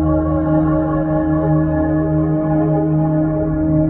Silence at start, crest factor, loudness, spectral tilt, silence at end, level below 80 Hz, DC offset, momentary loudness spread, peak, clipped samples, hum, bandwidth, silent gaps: 0 s; 10 dB; -16 LUFS; -13.5 dB/octave; 0 s; -30 dBFS; under 0.1%; 2 LU; -6 dBFS; under 0.1%; none; 3 kHz; none